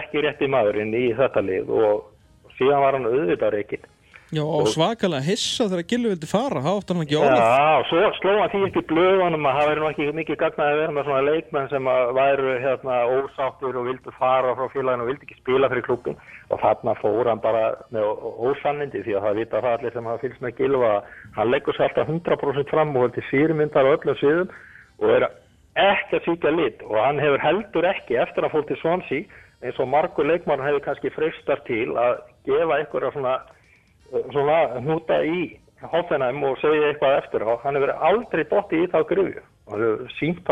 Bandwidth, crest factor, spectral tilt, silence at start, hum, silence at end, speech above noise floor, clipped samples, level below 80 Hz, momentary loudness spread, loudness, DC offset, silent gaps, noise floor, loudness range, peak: 11 kHz; 18 dB; -6 dB/octave; 0 s; none; 0 s; 34 dB; under 0.1%; -56 dBFS; 8 LU; -22 LUFS; under 0.1%; none; -56 dBFS; 4 LU; -4 dBFS